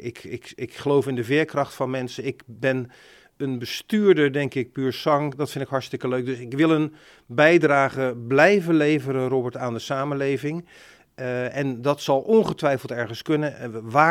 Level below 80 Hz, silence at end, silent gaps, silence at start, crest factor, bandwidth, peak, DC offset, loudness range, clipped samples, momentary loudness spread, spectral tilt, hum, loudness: -64 dBFS; 0 s; none; 0 s; 20 dB; 16 kHz; -2 dBFS; under 0.1%; 6 LU; under 0.1%; 13 LU; -6.5 dB/octave; none; -23 LUFS